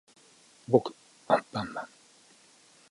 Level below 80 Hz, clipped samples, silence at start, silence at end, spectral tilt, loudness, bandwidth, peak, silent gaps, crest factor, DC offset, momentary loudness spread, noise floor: -70 dBFS; under 0.1%; 0.7 s; 1.05 s; -6.5 dB/octave; -29 LUFS; 11.5 kHz; -6 dBFS; none; 26 dB; under 0.1%; 18 LU; -60 dBFS